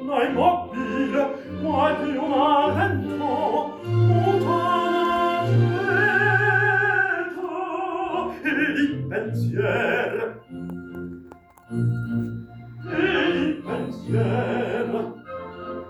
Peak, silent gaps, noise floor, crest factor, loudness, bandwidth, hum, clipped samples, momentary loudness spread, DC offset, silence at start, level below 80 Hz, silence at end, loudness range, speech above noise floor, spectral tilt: -6 dBFS; none; -47 dBFS; 16 dB; -22 LUFS; 12.5 kHz; none; under 0.1%; 15 LU; under 0.1%; 0 s; -58 dBFS; 0 s; 7 LU; 25 dB; -7.5 dB/octave